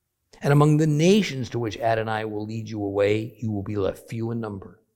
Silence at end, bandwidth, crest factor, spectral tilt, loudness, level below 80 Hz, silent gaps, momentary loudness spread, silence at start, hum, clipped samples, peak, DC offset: 0.25 s; 15 kHz; 20 dB; -6.5 dB/octave; -24 LUFS; -56 dBFS; none; 13 LU; 0.4 s; none; under 0.1%; -4 dBFS; under 0.1%